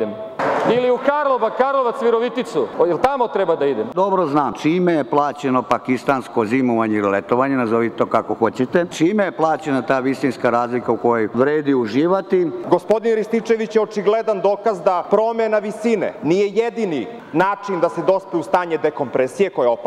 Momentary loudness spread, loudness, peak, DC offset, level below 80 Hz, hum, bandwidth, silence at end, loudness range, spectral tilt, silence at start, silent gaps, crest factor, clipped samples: 3 LU; -18 LUFS; -4 dBFS; under 0.1%; -60 dBFS; none; 12.5 kHz; 0 s; 1 LU; -6.5 dB/octave; 0 s; none; 14 dB; under 0.1%